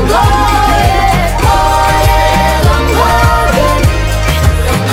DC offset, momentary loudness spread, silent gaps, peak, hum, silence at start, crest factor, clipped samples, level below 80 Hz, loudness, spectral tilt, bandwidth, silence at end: under 0.1%; 2 LU; none; 0 dBFS; none; 0 s; 8 dB; 0.8%; -14 dBFS; -9 LUFS; -5 dB/octave; 16.5 kHz; 0 s